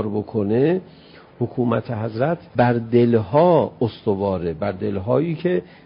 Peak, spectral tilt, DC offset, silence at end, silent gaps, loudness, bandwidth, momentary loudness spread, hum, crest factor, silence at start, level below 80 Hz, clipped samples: -4 dBFS; -13 dB/octave; under 0.1%; 0.2 s; none; -20 LUFS; 5.4 kHz; 9 LU; none; 16 dB; 0 s; -48 dBFS; under 0.1%